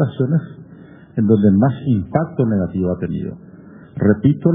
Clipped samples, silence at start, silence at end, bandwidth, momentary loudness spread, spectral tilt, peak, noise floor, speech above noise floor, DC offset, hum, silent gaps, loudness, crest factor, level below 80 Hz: under 0.1%; 0 s; 0 s; 3.8 kHz; 15 LU; -10 dB/octave; 0 dBFS; -41 dBFS; 25 dB; under 0.1%; none; none; -18 LUFS; 16 dB; -48 dBFS